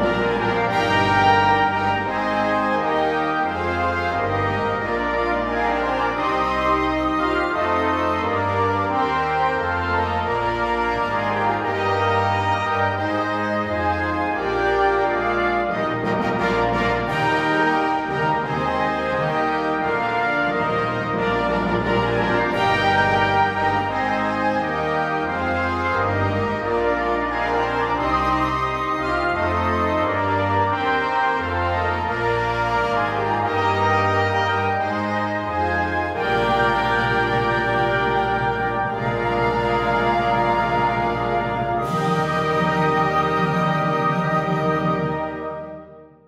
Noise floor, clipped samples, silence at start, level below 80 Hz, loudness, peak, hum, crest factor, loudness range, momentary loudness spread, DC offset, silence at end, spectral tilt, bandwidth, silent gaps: -42 dBFS; under 0.1%; 0 s; -42 dBFS; -20 LUFS; -2 dBFS; none; 18 dB; 2 LU; 4 LU; under 0.1%; 0.2 s; -6.5 dB/octave; 14.5 kHz; none